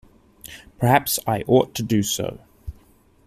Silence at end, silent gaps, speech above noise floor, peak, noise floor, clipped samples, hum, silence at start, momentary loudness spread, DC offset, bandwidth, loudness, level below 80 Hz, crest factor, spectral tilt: 0.55 s; none; 34 dB; -2 dBFS; -55 dBFS; under 0.1%; none; 0.5 s; 22 LU; under 0.1%; 15.5 kHz; -21 LUFS; -46 dBFS; 20 dB; -4.5 dB/octave